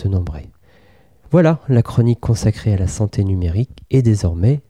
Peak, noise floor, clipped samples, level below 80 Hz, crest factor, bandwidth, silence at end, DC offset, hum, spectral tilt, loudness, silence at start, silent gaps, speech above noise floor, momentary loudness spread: -4 dBFS; -51 dBFS; under 0.1%; -34 dBFS; 14 dB; 11 kHz; 0.1 s; 0.2%; none; -8 dB/octave; -17 LUFS; 0 s; none; 36 dB; 7 LU